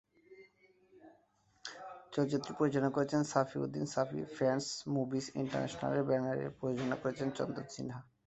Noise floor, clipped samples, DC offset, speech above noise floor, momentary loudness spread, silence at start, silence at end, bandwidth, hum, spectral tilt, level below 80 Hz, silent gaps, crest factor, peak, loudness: -71 dBFS; under 0.1%; under 0.1%; 36 dB; 11 LU; 0.3 s; 0.25 s; 8.2 kHz; none; -6 dB/octave; -72 dBFS; none; 22 dB; -14 dBFS; -36 LUFS